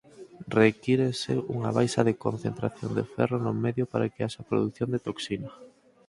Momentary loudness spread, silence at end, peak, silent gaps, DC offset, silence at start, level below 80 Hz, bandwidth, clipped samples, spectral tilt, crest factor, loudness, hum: 10 LU; 0.4 s; -6 dBFS; none; under 0.1%; 0.2 s; -60 dBFS; 11.5 kHz; under 0.1%; -6.5 dB/octave; 22 dB; -28 LUFS; none